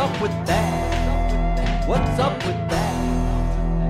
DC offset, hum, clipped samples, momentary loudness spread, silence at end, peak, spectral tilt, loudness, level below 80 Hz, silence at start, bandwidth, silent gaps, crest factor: under 0.1%; none; under 0.1%; 3 LU; 0 s; -8 dBFS; -6 dB/octave; -22 LUFS; -24 dBFS; 0 s; 14 kHz; none; 12 dB